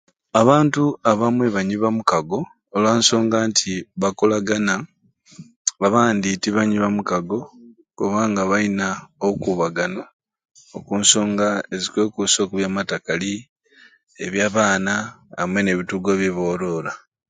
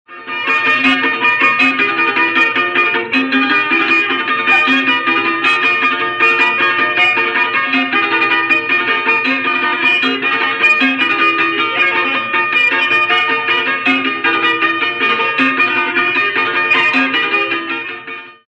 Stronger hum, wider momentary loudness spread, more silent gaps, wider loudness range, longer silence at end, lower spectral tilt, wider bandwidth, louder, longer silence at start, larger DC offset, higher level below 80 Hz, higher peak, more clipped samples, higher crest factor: neither; first, 11 LU vs 3 LU; first, 5.56-5.65 s, 10.13-10.19 s, 10.51-10.55 s, 13.49-13.56 s vs none; first, 4 LU vs 1 LU; first, 0.3 s vs 0.15 s; about the same, -4 dB/octave vs -3.5 dB/octave; about the same, 9.6 kHz vs 9 kHz; second, -20 LUFS vs -12 LUFS; first, 0.35 s vs 0.1 s; neither; first, -56 dBFS vs -62 dBFS; about the same, 0 dBFS vs -2 dBFS; neither; first, 20 dB vs 12 dB